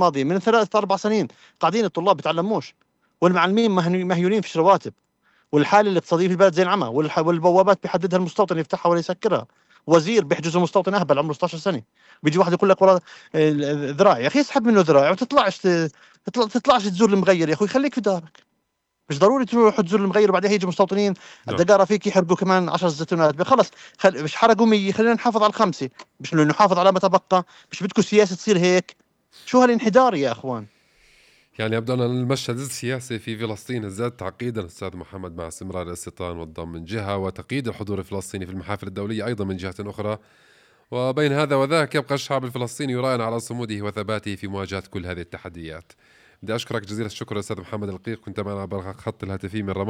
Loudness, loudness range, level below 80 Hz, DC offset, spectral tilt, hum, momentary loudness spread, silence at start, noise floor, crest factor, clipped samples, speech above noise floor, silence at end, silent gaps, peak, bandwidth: -21 LUFS; 11 LU; -62 dBFS; under 0.1%; -6 dB/octave; none; 15 LU; 0 s; -74 dBFS; 16 dB; under 0.1%; 54 dB; 0 s; none; -4 dBFS; 15 kHz